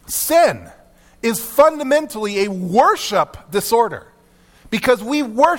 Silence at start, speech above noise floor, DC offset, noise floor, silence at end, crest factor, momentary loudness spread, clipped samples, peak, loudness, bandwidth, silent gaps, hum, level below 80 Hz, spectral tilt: 0.1 s; 35 dB; under 0.1%; -51 dBFS; 0 s; 16 dB; 8 LU; under 0.1%; 0 dBFS; -17 LUFS; 18 kHz; none; none; -50 dBFS; -3.5 dB/octave